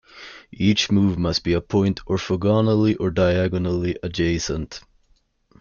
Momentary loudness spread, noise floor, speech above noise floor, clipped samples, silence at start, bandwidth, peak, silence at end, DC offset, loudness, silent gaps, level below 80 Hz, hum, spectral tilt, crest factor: 13 LU; -62 dBFS; 42 dB; under 0.1%; 0.15 s; 7.2 kHz; -6 dBFS; 0.8 s; under 0.1%; -21 LUFS; none; -44 dBFS; none; -6 dB/octave; 16 dB